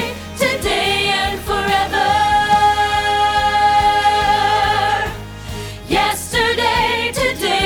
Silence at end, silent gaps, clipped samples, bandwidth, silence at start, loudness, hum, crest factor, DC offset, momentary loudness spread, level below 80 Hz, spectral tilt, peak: 0 s; none; under 0.1%; 19.5 kHz; 0 s; -15 LUFS; none; 14 dB; under 0.1%; 7 LU; -34 dBFS; -3 dB/octave; -2 dBFS